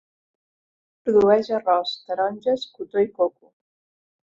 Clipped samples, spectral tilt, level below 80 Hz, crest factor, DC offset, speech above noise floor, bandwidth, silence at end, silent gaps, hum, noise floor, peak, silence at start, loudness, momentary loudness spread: under 0.1%; -6 dB/octave; -62 dBFS; 18 dB; under 0.1%; over 69 dB; 7.4 kHz; 1.05 s; none; none; under -90 dBFS; -4 dBFS; 1.05 s; -22 LUFS; 10 LU